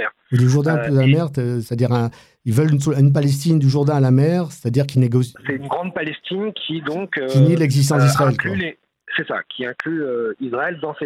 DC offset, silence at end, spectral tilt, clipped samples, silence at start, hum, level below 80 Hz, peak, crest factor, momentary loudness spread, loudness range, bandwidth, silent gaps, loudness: under 0.1%; 0 s; -6.5 dB/octave; under 0.1%; 0 s; none; -58 dBFS; -2 dBFS; 14 dB; 10 LU; 3 LU; 13.5 kHz; none; -18 LUFS